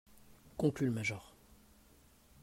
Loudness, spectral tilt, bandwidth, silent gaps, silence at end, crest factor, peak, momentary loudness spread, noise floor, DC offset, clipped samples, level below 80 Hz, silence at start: -36 LUFS; -6.5 dB/octave; 16 kHz; none; 1.15 s; 20 dB; -20 dBFS; 15 LU; -65 dBFS; under 0.1%; under 0.1%; -66 dBFS; 0.45 s